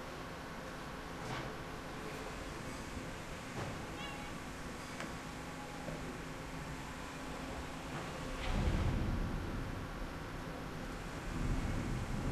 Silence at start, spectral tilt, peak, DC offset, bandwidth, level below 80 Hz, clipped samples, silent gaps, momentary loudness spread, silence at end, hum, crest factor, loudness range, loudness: 0 s; -5.5 dB/octave; -24 dBFS; under 0.1%; 13 kHz; -46 dBFS; under 0.1%; none; 7 LU; 0 s; none; 18 dB; 4 LU; -43 LUFS